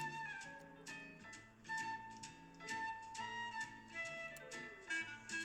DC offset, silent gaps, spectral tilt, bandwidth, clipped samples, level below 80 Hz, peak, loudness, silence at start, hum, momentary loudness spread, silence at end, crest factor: under 0.1%; none; -2 dB/octave; 15 kHz; under 0.1%; -76 dBFS; -32 dBFS; -47 LUFS; 0 s; none; 10 LU; 0 s; 16 dB